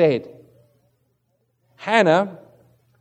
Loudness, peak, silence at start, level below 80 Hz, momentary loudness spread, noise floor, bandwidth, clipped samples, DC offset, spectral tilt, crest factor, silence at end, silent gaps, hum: -19 LUFS; -2 dBFS; 0 s; -74 dBFS; 18 LU; -69 dBFS; 9.4 kHz; under 0.1%; under 0.1%; -6 dB/octave; 22 dB; 0.65 s; none; none